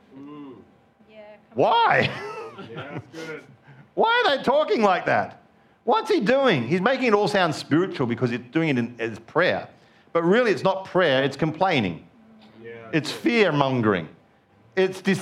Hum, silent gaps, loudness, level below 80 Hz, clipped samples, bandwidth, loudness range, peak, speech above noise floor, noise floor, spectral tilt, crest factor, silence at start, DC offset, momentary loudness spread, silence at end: none; none; -22 LUFS; -66 dBFS; under 0.1%; 14 kHz; 3 LU; -4 dBFS; 35 dB; -57 dBFS; -6 dB/octave; 20 dB; 0.15 s; under 0.1%; 17 LU; 0 s